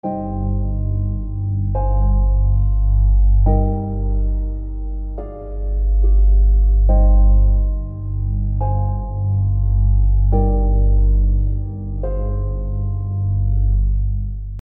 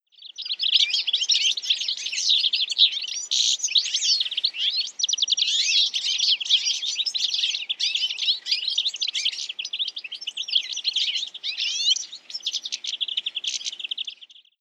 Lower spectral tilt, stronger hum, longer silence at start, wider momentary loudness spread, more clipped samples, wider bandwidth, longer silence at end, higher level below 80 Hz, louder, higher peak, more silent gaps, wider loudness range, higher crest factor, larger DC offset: first, -14.5 dB/octave vs 6 dB/octave; first, 50 Hz at -20 dBFS vs none; second, 0.05 s vs 0.2 s; about the same, 10 LU vs 10 LU; neither; second, 1.2 kHz vs 13.5 kHz; second, 0.05 s vs 0.35 s; first, -16 dBFS vs under -90 dBFS; first, -19 LUFS vs -22 LUFS; about the same, -4 dBFS vs -6 dBFS; neither; about the same, 3 LU vs 5 LU; second, 12 dB vs 18 dB; neither